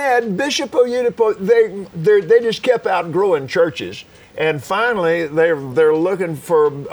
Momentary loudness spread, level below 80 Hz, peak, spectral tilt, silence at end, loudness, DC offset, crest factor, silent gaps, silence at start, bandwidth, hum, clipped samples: 6 LU; -58 dBFS; -2 dBFS; -5 dB/octave; 0 s; -16 LUFS; under 0.1%; 14 dB; none; 0 s; over 20 kHz; none; under 0.1%